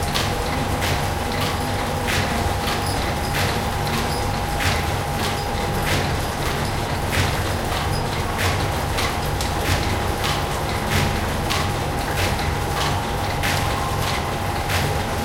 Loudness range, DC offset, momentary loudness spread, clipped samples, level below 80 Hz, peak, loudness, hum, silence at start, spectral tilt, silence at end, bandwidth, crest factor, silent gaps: 0 LU; under 0.1%; 3 LU; under 0.1%; -30 dBFS; -2 dBFS; -22 LUFS; none; 0 s; -4.5 dB/octave; 0 s; 17 kHz; 20 dB; none